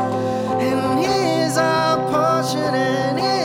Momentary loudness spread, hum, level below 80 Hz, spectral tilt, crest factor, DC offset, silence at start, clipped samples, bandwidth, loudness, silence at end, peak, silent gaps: 3 LU; none; -56 dBFS; -5 dB/octave; 12 dB; under 0.1%; 0 s; under 0.1%; 17.5 kHz; -19 LUFS; 0 s; -6 dBFS; none